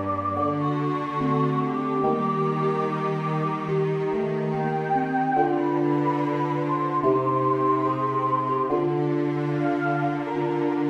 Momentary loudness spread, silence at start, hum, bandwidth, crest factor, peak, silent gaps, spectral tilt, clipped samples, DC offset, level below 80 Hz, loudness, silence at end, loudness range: 4 LU; 0 s; none; 7.6 kHz; 14 dB; -10 dBFS; none; -9 dB/octave; under 0.1%; under 0.1%; -62 dBFS; -24 LUFS; 0 s; 2 LU